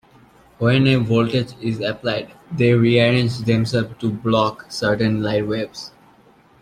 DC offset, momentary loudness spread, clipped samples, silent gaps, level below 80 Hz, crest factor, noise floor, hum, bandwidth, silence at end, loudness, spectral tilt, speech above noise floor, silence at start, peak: under 0.1%; 10 LU; under 0.1%; none; -52 dBFS; 16 dB; -52 dBFS; none; 10.5 kHz; 0.75 s; -19 LUFS; -7 dB/octave; 33 dB; 0.6 s; -2 dBFS